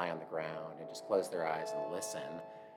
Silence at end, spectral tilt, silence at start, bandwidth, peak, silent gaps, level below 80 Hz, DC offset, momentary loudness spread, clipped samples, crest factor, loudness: 0 s; -4 dB/octave; 0 s; 17 kHz; -20 dBFS; none; -86 dBFS; under 0.1%; 11 LU; under 0.1%; 20 dB; -39 LUFS